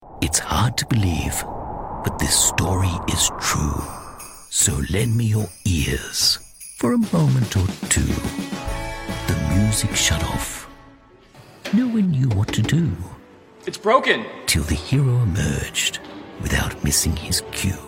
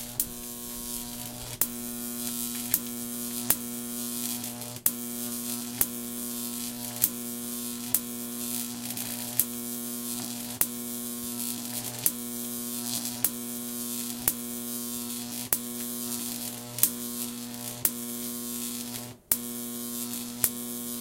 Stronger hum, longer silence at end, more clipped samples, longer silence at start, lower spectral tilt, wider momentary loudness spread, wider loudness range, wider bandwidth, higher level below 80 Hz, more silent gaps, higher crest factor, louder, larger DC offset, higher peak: neither; about the same, 0 s vs 0 s; neither; about the same, 0 s vs 0 s; first, -4 dB/octave vs -2 dB/octave; first, 12 LU vs 7 LU; about the same, 3 LU vs 1 LU; about the same, 17 kHz vs 17 kHz; first, -34 dBFS vs -60 dBFS; neither; second, 18 dB vs 32 dB; first, -21 LUFS vs -30 LUFS; neither; about the same, -2 dBFS vs 0 dBFS